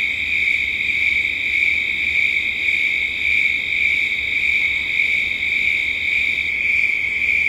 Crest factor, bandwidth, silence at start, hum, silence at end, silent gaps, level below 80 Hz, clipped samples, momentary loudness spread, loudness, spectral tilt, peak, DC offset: 14 dB; 16 kHz; 0 s; none; 0 s; none; -46 dBFS; under 0.1%; 2 LU; -16 LUFS; -1.5 dB/octave; -4 dBFS; under 0.1%